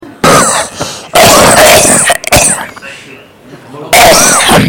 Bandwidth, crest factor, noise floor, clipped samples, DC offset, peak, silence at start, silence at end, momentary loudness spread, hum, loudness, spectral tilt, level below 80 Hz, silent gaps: over 20 kHz; 6 dB; -33 dBFS; 3%; under 0.1%; 0 dBFS; 0.05 s; 0 s; 15 LU; none; -4 LUFS; -2 dB/octave; -30 dBFS; none